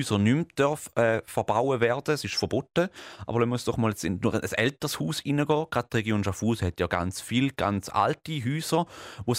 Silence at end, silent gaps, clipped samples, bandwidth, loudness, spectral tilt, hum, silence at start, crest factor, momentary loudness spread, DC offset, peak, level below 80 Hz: 0 s; none; under 0.1%; 16 kHz; -27 LUFS; -5.5 dB/octave; none; 0 s; 18 dB; 5 LU; under 0.1%; -10 dBFS; -54 dBFS